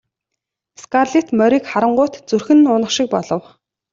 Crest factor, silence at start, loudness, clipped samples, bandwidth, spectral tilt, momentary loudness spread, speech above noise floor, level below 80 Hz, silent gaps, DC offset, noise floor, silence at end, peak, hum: 14 dB; 0.8 s; -16 LUFS; under 0.1%; 7.6 kHz; -4.5 dB/octave; 9 LU; 65 dB; -60 dBFS; none; under 0.1%; -80 dBFS; 0.55 s; -2 dBFS; none